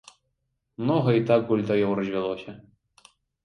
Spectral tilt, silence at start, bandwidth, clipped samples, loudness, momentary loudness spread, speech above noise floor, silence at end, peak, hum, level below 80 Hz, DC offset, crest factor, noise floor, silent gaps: -8.5 dB/octave; 0.8 s; 10.5 kHz; under 0.1%; -24 LUFS; 10 LU; 53 dB; 0.85 s; -8 dBFS; none; -64 dBFS; under 0.1%; 18 dB; -77 dBFS; none